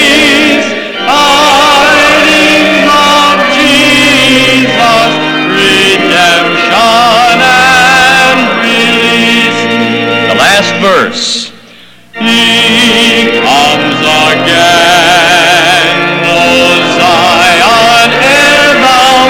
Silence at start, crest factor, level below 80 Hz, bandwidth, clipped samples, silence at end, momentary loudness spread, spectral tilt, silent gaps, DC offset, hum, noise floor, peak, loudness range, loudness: 0 s; 6 dB; -38 dBFS; 19 kHz; under 0.1%; 0 s; 5 LU; -2.5 dB/octave; none; under 0.1%; none; -35 dBFS; 0 dBFS; 3 LU; -4 LUFS